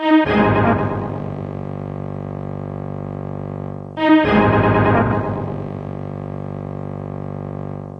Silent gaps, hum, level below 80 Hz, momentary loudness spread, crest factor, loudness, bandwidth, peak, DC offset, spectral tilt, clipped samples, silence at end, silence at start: none; 50 Hz at -45 dBFS; -40 dBFS; 14 LU; 16 dB; -20 LUFS; 5.6 kHz; -2 dBFS; under 0.1%; -9 dB/octave; under 0.1%; 0 s; 0 s